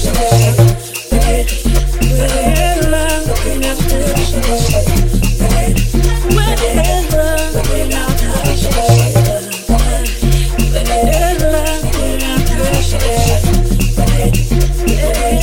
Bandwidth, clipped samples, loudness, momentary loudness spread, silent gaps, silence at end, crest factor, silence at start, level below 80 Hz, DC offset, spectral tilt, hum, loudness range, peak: 17 kHz; under 0.1%; -14 LUFS; 5 LU; none; 0 s; 12 dB; 0 s; -14 dBFS; under 0.1%; -5 dB/octave; none; 1 LU; 0 dBFS